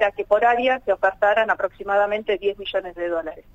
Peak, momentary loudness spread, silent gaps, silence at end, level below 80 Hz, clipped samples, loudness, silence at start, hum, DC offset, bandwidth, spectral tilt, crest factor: -6 dBFS; 8 LU; none; 0.15 s; -52 dBFS; under 0.1%; -21 LUFS; 0 s; none; under 0.1%; 7.8 kHz; -4.5 dB/octave; 16 dB